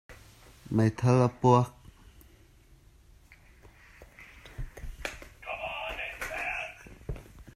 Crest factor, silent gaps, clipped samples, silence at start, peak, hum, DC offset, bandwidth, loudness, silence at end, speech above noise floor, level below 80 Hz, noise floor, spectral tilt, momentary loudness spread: 24 dB; none; under 0.1%; 0.1 s; -8 dBFS; none; under 0.1%; 14.5 kHz; -29 LUFS; 0.05 s; 34 dB; -50 dBFS; -58 dBFS; -7 dB/octave; 21 LU